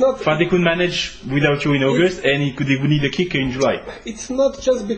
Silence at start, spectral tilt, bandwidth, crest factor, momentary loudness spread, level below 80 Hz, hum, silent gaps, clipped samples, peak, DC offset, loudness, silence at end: 0 s; -5.5 dB/octave; 8.8 kHz; 16 dB; 6 LU; -44 dBFS; none; none; under 0.1%; -2 dBFS; under 0.1%; -18 LUFS; 0 s